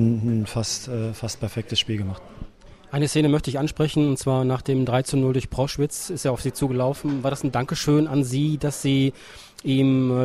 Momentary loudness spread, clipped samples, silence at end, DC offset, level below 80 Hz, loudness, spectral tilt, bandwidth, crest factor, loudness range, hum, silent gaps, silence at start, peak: 9 LU; under 0.1%; 0 s; under 0.1%; -46 dBFS; -23 LUFS; -6 dB/octave; 14.5 kHz; 14 dB; 3 LU; none; none; 0 s; -8 dBFS